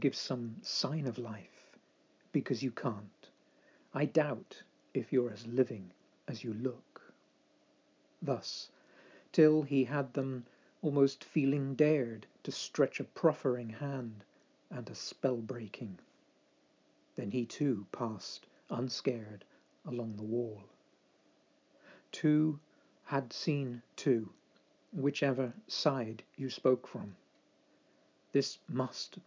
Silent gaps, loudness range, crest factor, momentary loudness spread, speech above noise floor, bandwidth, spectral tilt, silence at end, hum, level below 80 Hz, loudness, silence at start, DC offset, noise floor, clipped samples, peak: none; 8 LU; 22 dB; 16 LU; 36 dB; 7.6 kHz; -6 dB/octave; 0.05 s; none; -82 dBFS; -35 LUFS; 0 s; under 0.1%; -70 dBFS; under 0.1%; -14 dBFS